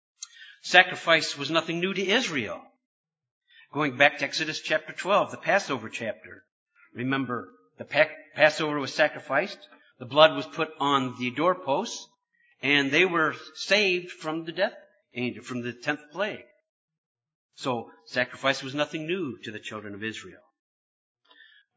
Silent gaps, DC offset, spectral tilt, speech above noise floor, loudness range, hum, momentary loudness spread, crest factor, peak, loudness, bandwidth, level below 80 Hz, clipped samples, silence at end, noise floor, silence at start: 2.85-3.04 s, 3.31-3.41 s, 6.52-6.66 s, 16.69-16.88 s, 16.98-17.15 s, 17.35-17.49 s; under 0.1%; -3.5 dB/octave; 41 dB; 8 LU; none; 16 LU; 28 dB; 0 dBFS; -26 LUFS; 8 kHz; -76 dBFS; under 0.1%; 1.4 s; -67 dBFS; 0.2 s